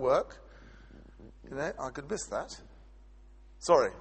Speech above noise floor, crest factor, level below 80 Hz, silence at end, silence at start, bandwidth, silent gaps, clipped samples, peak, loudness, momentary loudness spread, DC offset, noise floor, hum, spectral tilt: 24 dB; 24 dB; -54 dBFS; 0 s; 0 s; 8.4 kHz; none; under 0.1%; -10 dBFS; -33 LUFS; 28 LU; under 0.1%; -54 dBFS; none; -4 dB/octave